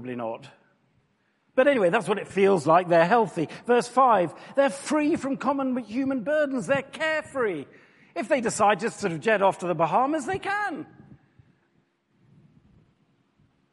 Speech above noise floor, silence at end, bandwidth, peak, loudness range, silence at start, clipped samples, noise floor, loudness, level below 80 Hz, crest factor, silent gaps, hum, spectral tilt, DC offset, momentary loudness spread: 45 dB; 2.9 s; 11.5 kHz; -6 dBFS; 7 LU; 0 s; under 0.1%; -69 dBFS; -24 LUFS; -68 dBFS; 20 dB; none; none; -5 dB/octave; under 0.1%; 11 LU